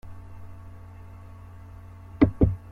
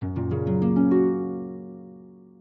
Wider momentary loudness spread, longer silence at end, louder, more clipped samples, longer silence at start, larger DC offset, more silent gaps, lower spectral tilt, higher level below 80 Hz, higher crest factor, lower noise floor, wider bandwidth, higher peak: first, 24 LU vs 20 LU; about the same, 0.15 s vs 0.25 s; about the same, -23 LUFS vs -23 LUFS; neither; about the same, 0.05 s vs 0 s; neither; neither; second, -10.5 dB/octave vs -12.5 dB/octave; first, -38 dBFS vs -56 dBFS; first, 24 dB vs 14 dB; about the same, -44 dBFS vs -47 dBFS; first, 5.2 kHz vs 4.1 kHz; first, -6 dBFS vs -10 dBFS